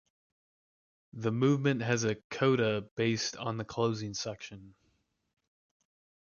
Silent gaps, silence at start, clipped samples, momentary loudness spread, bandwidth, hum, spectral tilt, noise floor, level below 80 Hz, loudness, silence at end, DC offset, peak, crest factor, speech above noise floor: 2.24-2.30 s, 2.91-2.97 s; 1.15 s; under 0.1%; 11 LU; 7.2 kHz; none; -5.5 dB/octave; -75 dBFS; -68 dBFS; -31 LUFS; 1.6 s; under 0.1%; -14 dBFS; 20 dB; 44 dB